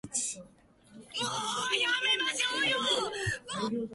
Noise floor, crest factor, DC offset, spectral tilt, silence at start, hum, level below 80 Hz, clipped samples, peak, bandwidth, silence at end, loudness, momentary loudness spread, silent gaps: -59 dBFS; 16 dB; under 0.1%; -1.5 dB/octave; 0.05 s; none; -62 dBFS; under 0.1%; -16 dBFS; 11.5 kHz; 0 s; -30 LUFS; 8 LU; none